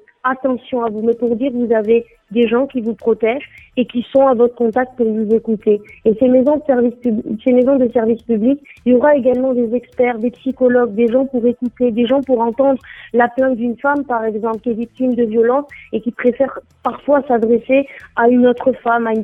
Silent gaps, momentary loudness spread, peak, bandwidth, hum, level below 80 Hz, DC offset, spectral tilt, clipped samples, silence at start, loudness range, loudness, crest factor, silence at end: none; 8 LU; -2 dBFS; 3.8 kHz; none; -52 dBFS; under 0.1%; -8.5 dB/octave; under 0.1%; 0.25 s; 3 LU; -16 LUFS; 14 dB; 0 s